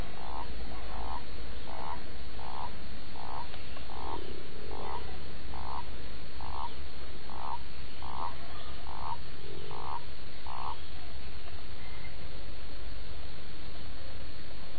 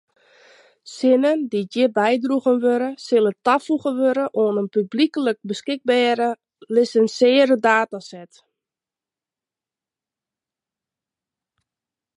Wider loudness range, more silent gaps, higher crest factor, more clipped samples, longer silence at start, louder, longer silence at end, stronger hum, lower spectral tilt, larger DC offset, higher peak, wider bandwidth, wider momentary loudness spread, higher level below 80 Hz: about the same, 3 LU vs 2 LU; neither; about the same, 18 dB vs 18 dB; neither; second, 0 s vs 0.85 s; second, -43 LUFS vs -19 LUFS; second, 0 s vs 3.95 s; neither; first, -7.5 dB/octave vs -5 dB/octave; first, 8% vs under 0.1%; second, -18 dBFS vs -4 dBFS; second, 4.9 kHz vs 11 kHz; second, 5 LU vs 9 LU; first, -48 dBFS vs -76 dBFS